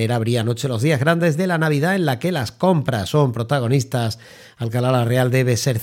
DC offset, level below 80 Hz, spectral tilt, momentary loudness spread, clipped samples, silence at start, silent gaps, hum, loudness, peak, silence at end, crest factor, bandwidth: under 0.1%; -56 dBFS; -6 dB/octave; 6 LU; under 0.1%; 0 s; none; none; -19 LUFS; -4 dBFS; 0 s; 16 dB; 16.5 kHz